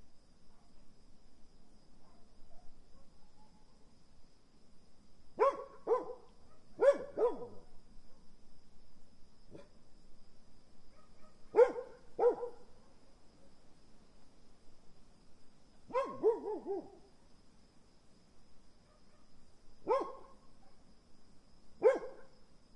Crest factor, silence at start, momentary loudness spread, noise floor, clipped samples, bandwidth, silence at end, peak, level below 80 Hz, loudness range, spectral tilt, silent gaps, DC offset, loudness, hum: 26 dB; 0 s; 26 LU; -61 dBFS; under 0.1%; 10.5 kHz; 0.1 s; -14 dBFS; -64 dBFS; 9 LU; -5.5 dB/octave; none; under 0.1%; -35 LUFS; none